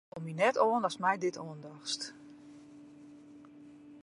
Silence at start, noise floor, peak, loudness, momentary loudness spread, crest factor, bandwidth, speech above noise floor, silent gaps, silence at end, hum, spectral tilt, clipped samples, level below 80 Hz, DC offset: 0.15 s; -54 dBFS; -14 dBFS; -32 LUFS; 25 LU; 22 dB; 11.5 kHz; 22 dB; none; 0 s; none; -4 dB/octave; under 0.1%; -80 dBFS; under 0.1%